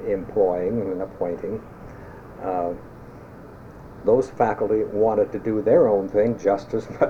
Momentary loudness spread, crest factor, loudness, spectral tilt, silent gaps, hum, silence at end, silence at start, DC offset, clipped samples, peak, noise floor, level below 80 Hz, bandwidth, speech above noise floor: 23 LU; 16 dB; -23 LUFS; -8.5 dB/octave; none; none; 0 s; 0 s; under 0.1%; under 0.1%; -6 dBFS; -42 dBFS; -50 dBFS; 8 kHz; 20 dB